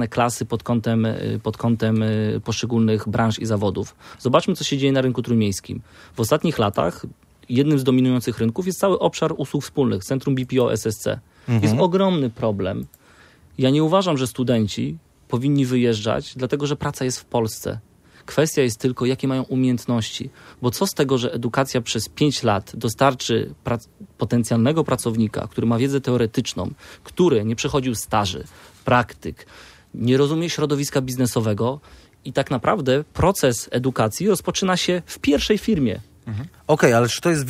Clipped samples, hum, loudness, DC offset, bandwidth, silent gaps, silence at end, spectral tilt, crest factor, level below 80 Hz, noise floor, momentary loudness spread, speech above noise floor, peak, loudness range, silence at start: under 0.1%; none; -21 LUFS; under 0.1%; 16 kHz; none; 0 s; -5.5 dB/octave; 20 dB; -48 dBFS; -51 dBFS; 11 LU; 30 dB; -2 dBFS; 2 LU; 0 s